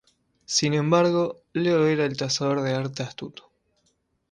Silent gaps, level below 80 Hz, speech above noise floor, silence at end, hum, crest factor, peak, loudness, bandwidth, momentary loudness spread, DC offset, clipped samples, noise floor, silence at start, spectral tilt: none; -64 dBFS; 47 dB; 1 s; none; 18 dB; -6 dBFS; -24 LUFS; 11 kHz; 13 LU; under 0.1%; under 0.1%; -71 dBFS; 0.5 s; -5 dB/octave